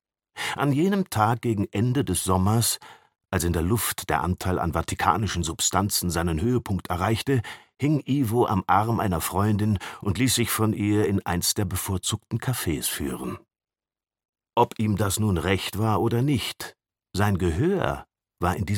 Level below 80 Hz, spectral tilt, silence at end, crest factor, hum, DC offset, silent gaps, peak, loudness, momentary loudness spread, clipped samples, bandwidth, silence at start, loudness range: -44 dBFS; -5 dB/octave; 0 s; 20 dB; none; under 0.1%; 14.25-14.33 s; -4 dBFS; -25 LUFS; 7 LU; under 0.1%; 17.5 kHz; 0.35 s; 3 LU